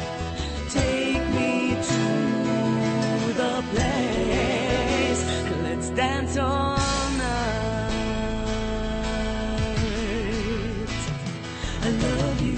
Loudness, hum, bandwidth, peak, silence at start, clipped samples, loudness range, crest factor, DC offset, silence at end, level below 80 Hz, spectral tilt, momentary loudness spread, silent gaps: -25 LUFS; none; 8.8 kHz; -10 dBFS; 0 s; under 0.1%; 4 LU; 14 dB; under 0.1%; 0 s; -34 dBFS; -5 dB/octave; 6 LU; none